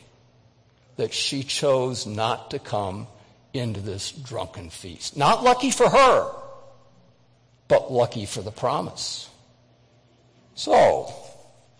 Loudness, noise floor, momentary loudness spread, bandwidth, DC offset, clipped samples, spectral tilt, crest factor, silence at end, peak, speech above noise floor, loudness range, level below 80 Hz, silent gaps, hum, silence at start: -23 LUFS; -59 dBFS; 20 LU; 10.5 kHz; under 0.1%; under 0.1%; -4 dB/octave; 16 dB; 0.45 s; -8 dBFS; 37 dB; 6 LU; -56 dBFS; none; none; 1 s